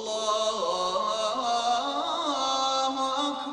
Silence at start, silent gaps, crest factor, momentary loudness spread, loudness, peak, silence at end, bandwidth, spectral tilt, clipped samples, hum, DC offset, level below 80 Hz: 0 s; none; 14 dB; 2 LU; -27 LUFS; -14 dBFS; 0 s; 11 kHz; -1.5 dB/octave; under 0.1%; none; under 0.1%; -68 dBFS